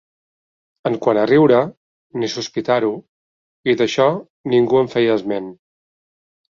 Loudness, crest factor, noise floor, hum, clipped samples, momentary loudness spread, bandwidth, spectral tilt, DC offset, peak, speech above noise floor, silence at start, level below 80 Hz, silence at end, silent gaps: -18 LUFS; 16 dB; under -90 dBFS; none; under 0.1%; 13 LU; 7.4 kHz; -6 dB/octave; under 0.1%; -2 dBFS; over 73 dB; 0.85 s; -60 dBFS; 0.95 s; 1.77-2.10 s, 3.08-3.64 s, 4.30-4.44 s